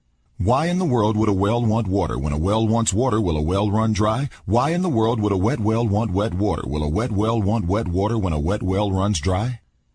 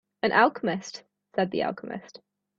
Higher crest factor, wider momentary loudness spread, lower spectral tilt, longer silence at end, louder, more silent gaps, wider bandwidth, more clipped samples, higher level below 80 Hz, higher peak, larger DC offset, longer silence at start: second, 14 dB vs 24 dB; second, 3 LU vs 19 LU; first, -6.5 dB/octave vs -5 dB/octave; about the same, 0.4 s vs 0.4 s; first, -21 LUFS vs -26 LUFS; neither; first, 10.5 kHz vs 7.8 kHz; neither; first, -36 dBFS vs -70 dBFS; about the same, -6 dBFS vs -4 dBFS; neither; first, 0.4 s vs 0.25 s